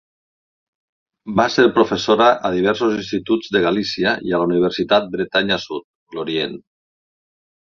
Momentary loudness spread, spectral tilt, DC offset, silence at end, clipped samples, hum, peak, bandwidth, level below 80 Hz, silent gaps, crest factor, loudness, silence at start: 13 LU; -5 dB/octave; under 0.1%; 1.2 s; under 0.1%; none; 0 dBFS; 7.2 kHz; -54 dBFS; 5.84-6.07 s; 18 dB; -18 LUFS; 1.25 s